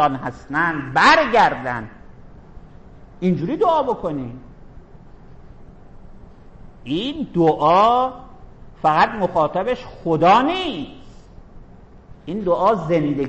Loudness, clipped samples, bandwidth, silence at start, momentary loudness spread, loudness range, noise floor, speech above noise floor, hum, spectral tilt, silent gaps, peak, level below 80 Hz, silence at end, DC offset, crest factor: -18 LUFS; under 0.1%; 8.6 kHz; 0 s; 16 LU; 7 LU; -43 dBFS; 25 dB; none; -6 dB/octave; none; -4 dBFS; -44 dBFS; 0 s; under 0.1%; 16 dB